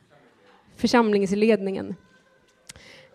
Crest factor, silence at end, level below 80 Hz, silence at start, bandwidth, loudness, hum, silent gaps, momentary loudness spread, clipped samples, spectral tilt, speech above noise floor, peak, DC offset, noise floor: 18 dB; 1.2 s; -60 dBFS; 0.8 s; 13.5 kHz; -22 LUFS; none; none; 19 LU; under 0.1%; -5.5 dB/octave; 39 dB; -6 dBFS; under 0.1%; -60 dBFS